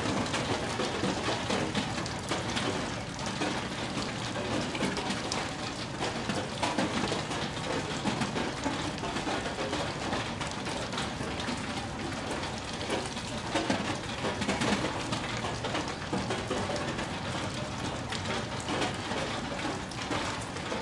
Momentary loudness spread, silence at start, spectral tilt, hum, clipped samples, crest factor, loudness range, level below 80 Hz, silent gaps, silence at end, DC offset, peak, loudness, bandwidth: 4 LU; 0 s; -4 dB/octave; none; under 0.1%; 20 dB; 2 LU; -52 dBFS; none; 0 s; under 0.1%; -12 dBFS; -32 LUFS; 11.5 kHz